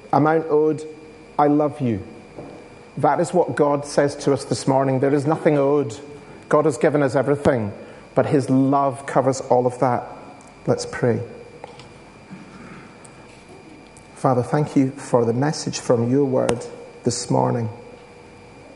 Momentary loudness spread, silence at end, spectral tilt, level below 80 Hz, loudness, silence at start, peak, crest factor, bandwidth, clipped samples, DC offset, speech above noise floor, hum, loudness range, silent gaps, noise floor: 22 LU; 0.05 s; -6.5 dB/octave; -54 dBFS; -20 LUFS; 0.05 s; 0 dBFS; 20 dB; 11.5 kHz; under 0.1%; under 0.1%; 24 dB; none; 8 LU; none; -44 dBFS